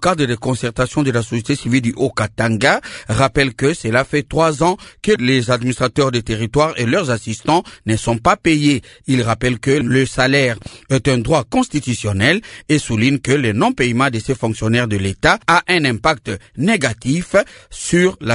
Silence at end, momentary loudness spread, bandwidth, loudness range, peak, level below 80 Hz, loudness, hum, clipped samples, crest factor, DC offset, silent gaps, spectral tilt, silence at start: 0 s; 6 LU; 11 kHz; 1 LU; 0 dBFS; -40 dBFS; -16 LUFS; none; under 0.1%; 16 dB; under 0.1%; none; -5 dB/octave; 0 s